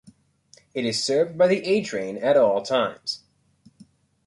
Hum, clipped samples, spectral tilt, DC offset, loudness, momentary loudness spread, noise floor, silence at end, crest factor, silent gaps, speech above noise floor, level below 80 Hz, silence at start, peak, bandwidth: none; under 0.1%; -4 dB/octave; under 0.1%; -22 LUFS; 12 LU; -58 dBFS; 1.1 s; 16 dB; none; 36 dB; -68 dBFS; 0.75 s; -8 dBFS; 11.5 kHz